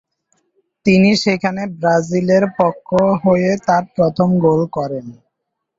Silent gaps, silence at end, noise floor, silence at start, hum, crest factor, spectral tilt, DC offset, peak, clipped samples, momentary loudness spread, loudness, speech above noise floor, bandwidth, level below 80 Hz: none; 0.65 s; -76 dBFS; 0.85 s; none; 14 dB; -6.5 dB/octave; under 0.1%; -2 dBFS; under 0.1%; 8 LU; -15 LUFS; 61 dB; 7.8 kHz; -52 dBFS